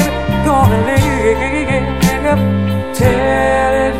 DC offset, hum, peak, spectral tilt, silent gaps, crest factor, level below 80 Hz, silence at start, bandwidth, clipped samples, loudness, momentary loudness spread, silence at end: 3%; none; 0 dBFS; -6 dB/octave; none; 12 dB; -26 dBFS; 0 s; 16 kHz; under 0.1%; -13 LUFS; 4 LU; 0 s